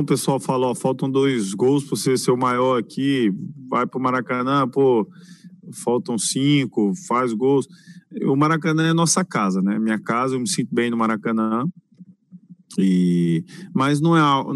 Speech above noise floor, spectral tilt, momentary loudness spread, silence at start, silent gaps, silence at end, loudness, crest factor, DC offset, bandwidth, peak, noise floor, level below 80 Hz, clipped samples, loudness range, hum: 28 dB; -5.5 dB/octave; 6 LU; 0 s; none; 0 s; -20 LUFS; 14 dB; under 0.1%; 12.5 kHz; -6 dBFS; -48 dBFS; -68 dBFS; under 0.1%; 2 LU; none